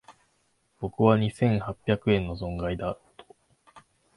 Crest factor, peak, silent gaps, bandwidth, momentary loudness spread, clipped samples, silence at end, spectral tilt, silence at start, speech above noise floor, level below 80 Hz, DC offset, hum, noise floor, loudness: 22 dB; -6 dBFS; none; 11.5 kHz; 14 LU; under 0.1%; 0.4 s; -8 dB/octave; 0.1 s; 45 dB; -48 dBFS; under 0.1%; none; -70 dBFS; -27 LUFS